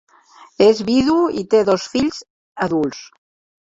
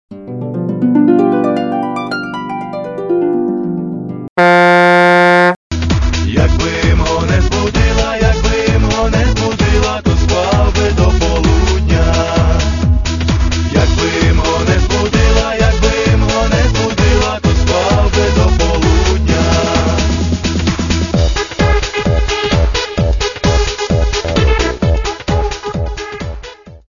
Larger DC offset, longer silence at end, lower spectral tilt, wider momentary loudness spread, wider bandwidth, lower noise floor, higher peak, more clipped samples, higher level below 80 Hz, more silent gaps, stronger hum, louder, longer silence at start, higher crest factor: neither; first, 0.75 s vs 0.15 s; about the same, -5.5 dB/octave vs -5.5 dB/octave; about the same, 10 LU vs 9 LU; second, 7.8 kHz vs 9.4 kHz; first, -47 dBFS vs -32 dBFS; about the same, -2 dBFS vs 0 dBFS; neither; second, -52 dBFS vs -16 dBFS; about the same, 2.30-2.55 s vs 4.29-4.36 s, 5.56-5.70 s; neither; second, -17 LUFS vs -13 LUFS; first, 0.4 s vs 0.1 s; about the same, 16 dB vs 12 dB